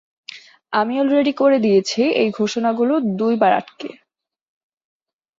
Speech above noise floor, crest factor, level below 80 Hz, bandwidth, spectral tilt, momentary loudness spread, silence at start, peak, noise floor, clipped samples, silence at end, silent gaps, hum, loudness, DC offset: 56 dB; 16 dB; -66 dBFS; 7.8 kHz; -5.5 dB/octave; 18 LU; 0.3 s; -4 dBFS; -73 dBFS; under 0.1%; 1.45 s; none; none; -18 LUFS; under 0.1%